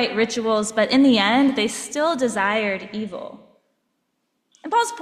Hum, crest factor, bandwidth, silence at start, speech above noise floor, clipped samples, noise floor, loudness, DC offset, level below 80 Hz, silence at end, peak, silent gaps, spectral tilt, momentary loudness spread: none; 16 dB; 13.5 kHz; 0 s; 53 dB; under 0.1%; -73 dBFS; -20 LUFS; under 0.1%; -64 dBFS; 0 s; -6 dBFS; none; -3.5 dB/octave; 15 LU